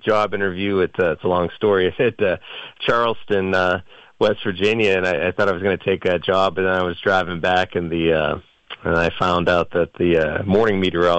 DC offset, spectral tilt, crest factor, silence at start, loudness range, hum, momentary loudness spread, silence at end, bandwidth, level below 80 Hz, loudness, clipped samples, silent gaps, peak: under 0.1%; -6.5 dB/octave; 12 dB; 0.05 s; 1 LU; none; 4 LU; 0 s; 8.2 kHz; -50 dBFS; -19 LUFS; under 0.1%; none; -6 dBFS